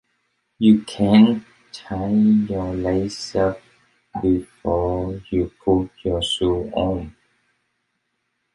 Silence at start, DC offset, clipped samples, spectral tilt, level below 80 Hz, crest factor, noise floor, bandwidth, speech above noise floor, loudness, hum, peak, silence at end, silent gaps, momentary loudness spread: 0.6 s; under 0.1%; under 0.1%; -6.5 dB/octave; -42 dBFS; 18 dB; -73 dBFS; 11 kHz; 54 dB; -20 LUFS; none; -2 dBFS; 1.45 s; none; 12 LU